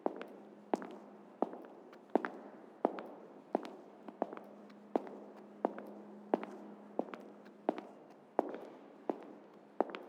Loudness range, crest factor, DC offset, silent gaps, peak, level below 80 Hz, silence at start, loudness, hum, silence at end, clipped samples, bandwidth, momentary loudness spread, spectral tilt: 2 LU; 30 dB; under 0.1%; none; -12 dBFS; under -90 dBFS; 0 s; -42 LUFS; none; 0 s; under 0.1%; 14 kHz; 16 LU; -7 dB/octave